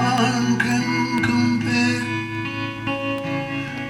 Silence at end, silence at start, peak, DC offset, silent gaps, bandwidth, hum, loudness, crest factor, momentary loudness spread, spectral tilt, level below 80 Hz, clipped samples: 0 s; 0 s; -4 dBFS; under 0.1%; none; 14 kHz; none; -21 LUFS; 16 dB; 7 LU; -5 dB/octave; -52 dBFS; under 0.1%